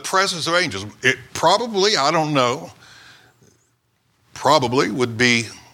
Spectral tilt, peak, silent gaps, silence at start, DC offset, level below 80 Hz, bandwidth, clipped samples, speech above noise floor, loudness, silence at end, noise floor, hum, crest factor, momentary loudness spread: -3.5 dB/octave; 0 dBFS; none; 0 s; under 0.1%; -60 dBFS; 18 kHz; under 0.1%; 46 dB; -18 LUFS; 0.15 s; -65 dBFS; none; 20 dB; 6 LU